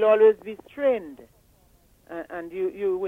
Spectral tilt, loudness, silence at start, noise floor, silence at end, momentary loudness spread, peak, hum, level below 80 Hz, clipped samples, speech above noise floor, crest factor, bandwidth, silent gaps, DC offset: -6.5 dB/octave; -24 LUFS; 0 s; -59 dBFS; 0 s; 20 LU; -8 dBFS; none; -64 dBFS; under 0.1%; 36 dB; 18 dB; 3.8 kHz; none; under 0.1%